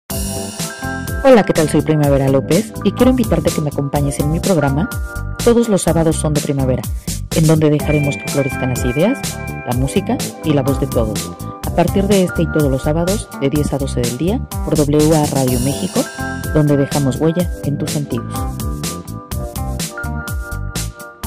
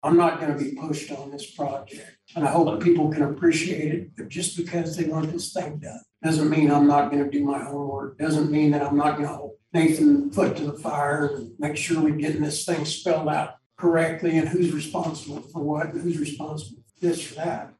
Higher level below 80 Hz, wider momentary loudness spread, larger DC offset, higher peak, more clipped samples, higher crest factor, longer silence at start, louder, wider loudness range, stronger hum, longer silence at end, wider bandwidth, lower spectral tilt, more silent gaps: first, -28 dBFS vs -64 dBFS; second, 10 LU vs 15 LU; neither; first, 0 dBFS vs -8 dBFS; neither; about the same, 16 dB vs 16 dB; about the same, 0.1 s vs 0.05 s; first, -16 LUFS vs -24 LUFS; about the same, 4 LU vs 4 LU; neither; about the same, 0 s vs 0.1 s; first, 16 kHz vs 12.5 kHz; about the same, -6 dB/octave vs -6 dB/octave; second, none vs 13.66-13.70 s